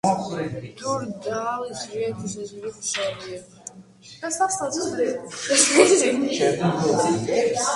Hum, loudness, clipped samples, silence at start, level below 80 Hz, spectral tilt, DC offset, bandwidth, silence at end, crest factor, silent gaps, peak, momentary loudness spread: none; -22 LUFS; under 0.1%; 0.05 s; -60 dBFS; -3.5 dB/octave; under 0.1%; 11.5 kHz; 0 s; 22 dB; none; 0 dBFS; 18 LU